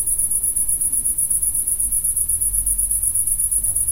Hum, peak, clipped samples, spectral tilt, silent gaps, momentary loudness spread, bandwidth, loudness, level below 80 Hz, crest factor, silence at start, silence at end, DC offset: none; -4 dBFS; under 0.1%; -1.5 dB/octave; none; 1 LU; 16 kHz; -17 LUFS; -36 dBFS; 16 dB; 0 s; 0 s; under 0.1%